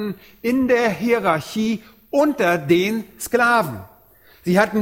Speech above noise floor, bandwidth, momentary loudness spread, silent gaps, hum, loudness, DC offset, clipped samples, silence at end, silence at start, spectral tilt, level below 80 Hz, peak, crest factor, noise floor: 32 dB; 17 kHz; 11 LU; none; none; -19 LUFS; under 0.1%; under 0.1%; 0 s; 0 s; -5.5 dB/octave; -54 dBFS; -2 dBFS; 18 dB; -51 dBFS